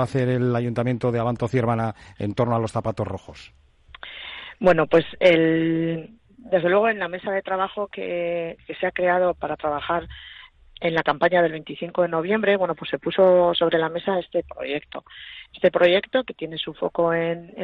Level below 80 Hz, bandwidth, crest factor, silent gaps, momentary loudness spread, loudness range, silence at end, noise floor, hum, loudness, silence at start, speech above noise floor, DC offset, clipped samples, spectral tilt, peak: -54 dBFS; 10 kHz; 18 dB; none; 15 LU; 5 LU; 0 s; -43 dBFS; none; -22 LUFS; 0 s; 21 dB; under 0.1%; under 0.1%; -7 dB/octave; -4 dBFS